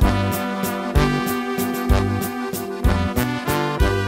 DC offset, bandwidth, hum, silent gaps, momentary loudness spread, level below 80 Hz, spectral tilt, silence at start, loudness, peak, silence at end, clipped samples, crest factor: under 0.1%; 16.5 kHz; none; none; 5 LU; -26 dBFS; -5.5 dB/octave; 0 s; -21 LUFS; -2 dBFS; 0 s; under 0.1%; 18 dB